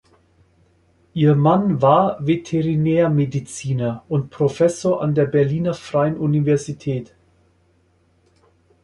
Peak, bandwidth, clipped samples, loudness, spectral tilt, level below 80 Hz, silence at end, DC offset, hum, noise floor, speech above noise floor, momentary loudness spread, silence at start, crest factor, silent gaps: -2 dBFS; 11.5 kHz; under 0.1%; -19 LUFS; -7.5 dB/octave; -54 dBFS; 1.8 s; under 0.1%; none; -60 dBFS; 42 dB; 10 LU; 1.15 s; 18 dB; none